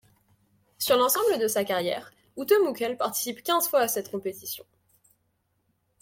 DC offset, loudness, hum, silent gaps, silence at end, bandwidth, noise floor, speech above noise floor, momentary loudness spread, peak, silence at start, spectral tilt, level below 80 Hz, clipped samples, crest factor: under 0.1%; -26 LUFS; none; none; 1.4 s; 16.5 kHz; -73 dBFS; 48 dB; 14 LU; -10 dBFS; 0.8 s; -2.5 dB/octave; -72 dBFS; under 0.1%; 18 dB